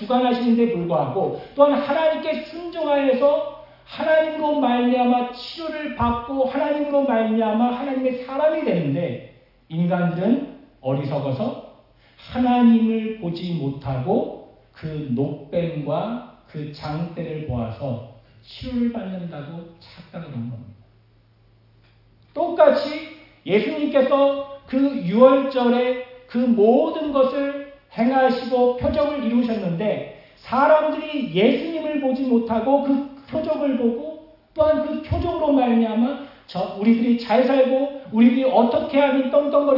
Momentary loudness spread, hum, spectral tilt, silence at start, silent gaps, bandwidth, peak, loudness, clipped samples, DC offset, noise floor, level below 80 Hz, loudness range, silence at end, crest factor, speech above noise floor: 15 LU; none; -9 dB/octave; 0 s; none; 5.8 kHz; -2 dBFS; -21 LUFS; under 0.1%; under 0.1%; -56 dBFS; -50 dBFS; 10 LU; 0 s; 20 dB; 36 dB